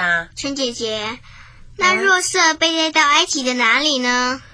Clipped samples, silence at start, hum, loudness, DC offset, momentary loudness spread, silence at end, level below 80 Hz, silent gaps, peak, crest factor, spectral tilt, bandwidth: under 0.1%; 0 s; none; -16 LUFS; under 0.1%; 10 LU; 0.1 s; -48 dBFS; none; 0 dBFS; 18 dB; -1 dB/octave; 10.5 kHz